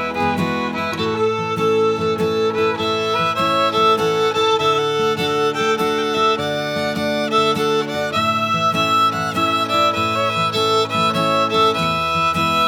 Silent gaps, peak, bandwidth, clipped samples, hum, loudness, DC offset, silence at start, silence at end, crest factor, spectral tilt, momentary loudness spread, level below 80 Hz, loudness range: none; -4 dBFS; 19.5 kHz; under 0.1%; none; -17 LUFS; under 0.1%; 0 s; 0 s; 14 dB; -4.5 dB/octave; 5 LU; -54 dBFS; 2 LU